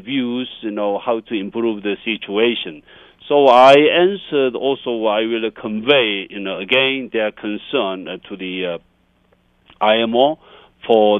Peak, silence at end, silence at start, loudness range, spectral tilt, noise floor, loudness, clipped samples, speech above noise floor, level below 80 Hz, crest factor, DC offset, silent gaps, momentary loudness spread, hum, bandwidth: 0 dBFS; 0 s; 0.05 s; 7 LU; -5.5 dB/octave; -58 dBFS; -17 LUFS; under 0.1%; 41 dB; -60 dBFS; 18 dB; under 0.1%; none; 14 LU; none; 8.8 kHz